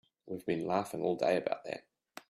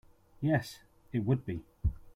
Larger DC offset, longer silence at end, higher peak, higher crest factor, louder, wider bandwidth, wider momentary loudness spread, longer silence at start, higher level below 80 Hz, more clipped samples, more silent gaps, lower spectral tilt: neither; about the same, 0.1 s vs 0.05 s; about the same, -16 dBFS vs -14 dBFS; about the same, 18 dB vs 20 dB; about the same, -34 LUFS vs -34 LUFS; about the same, 15.5 kHz vs 15.5 kHz; about the same, 14 LU vs 12 LU; second, 0.25 s vs 0.4 s; second, -76 dBFS vs -44 dBFS; neither; neither; second, -6 dB/octave vs -7.5 dB/octave